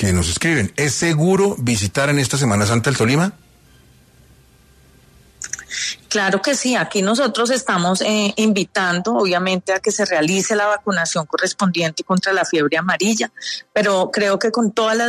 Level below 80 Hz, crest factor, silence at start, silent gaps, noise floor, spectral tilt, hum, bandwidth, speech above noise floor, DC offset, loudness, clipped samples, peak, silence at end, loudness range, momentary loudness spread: -46 dBFS; 14 dB; 0 s; none; -50 dBFS; -4 dB/octave; none; 13.5 kHz; 33 dB; under 0.1%; -18 LUFS; under 0.1%; -4 dBFS; 0 s; 5 LU; 4 LU